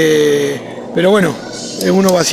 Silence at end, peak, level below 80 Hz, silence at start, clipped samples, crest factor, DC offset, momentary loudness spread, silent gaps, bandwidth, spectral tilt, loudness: 0 s; 0 dBFS; -52 dBFS; 0 s; under 0.1%; 12 dB; under 0.1%; 13 LU; none; 15.5 kHz; -4.5 dB/octave; -14 LUFS